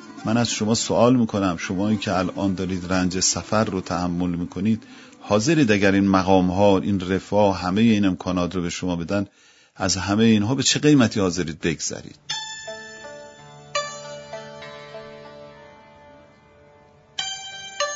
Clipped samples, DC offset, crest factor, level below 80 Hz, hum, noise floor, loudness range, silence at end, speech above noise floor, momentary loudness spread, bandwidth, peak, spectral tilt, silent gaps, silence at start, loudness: under 0.1%; under 0.1%; 20 dB; -52 dBFS; none; -52 dBFS; 15 LU; 0 s; 32 dB; 19 LU; 8 kHz; -2 dBFS; -4.5 dB/octave; none; 0 s; -21 LUFS